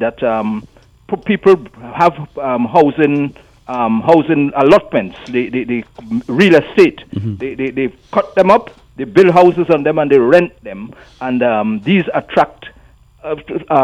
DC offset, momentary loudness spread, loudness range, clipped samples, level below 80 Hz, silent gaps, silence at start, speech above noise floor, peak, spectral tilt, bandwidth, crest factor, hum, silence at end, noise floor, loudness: under 0.1%; 14 LU; 3 LU; under 0.1%; -48 dBFS; none; 0 s; 32 dB; 0 dBFS; -7.5 dB/octave; 10 kHz; 14 dB; none; 0 s; -45 dBFS; -13 LUFS